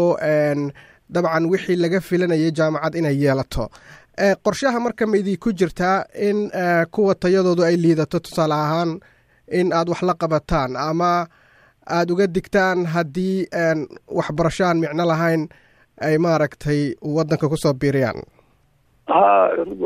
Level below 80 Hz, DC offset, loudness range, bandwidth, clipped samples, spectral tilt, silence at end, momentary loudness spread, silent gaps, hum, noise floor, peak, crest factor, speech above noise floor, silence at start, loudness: -44 dBFS; under 0.1%; 2 LU; 15.5 kHz; under 0.1%; -6.5 dB/octave; 0 s; 8 LU; none; none; -59 dBFS; -2 dBFS; 18 dB; 40 dB; 0 s; -20 LUFS